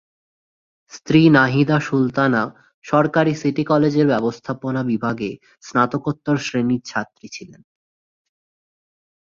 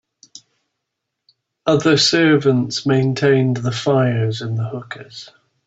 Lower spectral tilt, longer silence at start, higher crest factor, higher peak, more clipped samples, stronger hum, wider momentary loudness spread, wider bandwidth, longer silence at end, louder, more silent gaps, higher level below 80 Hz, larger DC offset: about the same, -6.5 dB/octave vs -5.5 dB/octave; second, 0.95 s vs 1.65 s; about the same, 18 dB vs 16 dB; about the same, -2 dBFS vs -4 dBFS; neither; neither; second, 14 LU vs 17 LU; about the same, 7.4 kHz vs 8 kHz; first, 1.95 s vs 0.4 s; about the same, -19 LUFS vs -17 LUFS; first, 2.74-2.82 s vs none; about the same, -58 dBFS vs -58 dBFS; neither